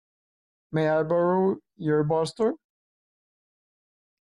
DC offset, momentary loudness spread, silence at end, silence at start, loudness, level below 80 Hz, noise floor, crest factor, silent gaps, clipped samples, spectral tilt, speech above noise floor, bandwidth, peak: under 0.1%; 8 LU; 1.65 s; 0.7 s; -25 LUFS; -66 dBFS; under -90 dBFS; 14 dB; none; under 0.1%; -7.5 dB/octave; over 66 dB; 11 kHz; -14 dBFS